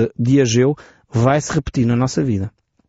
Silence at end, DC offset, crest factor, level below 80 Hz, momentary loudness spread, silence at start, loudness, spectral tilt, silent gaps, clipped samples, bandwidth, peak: 0.4 s; under 0.1%; 14 dB; -42 dBFS; 10 LU; 0 s; -17 LUFS; -7 dB/octave; none; under 0.1%; 8 kHz; -4 dBFS